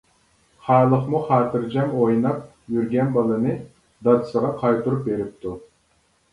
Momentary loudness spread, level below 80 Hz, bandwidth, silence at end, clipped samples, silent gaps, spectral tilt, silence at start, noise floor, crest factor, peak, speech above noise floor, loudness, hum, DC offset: 12 LU; -56 dBFS; 11 kHz; 0.7 s; under 0.1%; none; -9.5 dB/octave; 0.65 s; -63 dBFS; 20 dB; -2 dBFS; 43 dB; -21 LUFS; none; under 0.1%